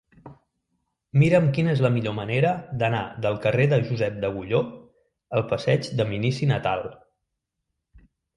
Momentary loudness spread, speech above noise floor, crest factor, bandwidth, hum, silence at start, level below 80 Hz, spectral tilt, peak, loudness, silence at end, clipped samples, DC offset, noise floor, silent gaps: 8 LU; 58 dB; 18 dB; 11 kHz; none; 0.25 s; -56 dBFS; -7.5 dB/octave; -6 dBFS; -24 LUFS; 0.4 s; under 0.1%; under 0.1%; -81 dBFS; none